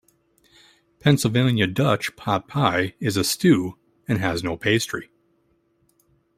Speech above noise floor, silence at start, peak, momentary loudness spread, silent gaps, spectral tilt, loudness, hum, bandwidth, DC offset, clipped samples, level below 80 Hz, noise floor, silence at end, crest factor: 45 dB; 1.05 s; -2 dBFS; 8 LU; none; -5 dB/octave; -22 LUFS; none; 16 kHz; under 0.1%; under 0.1%; -56 dBFS; -66 dBFS; 1.35 s; 20 dB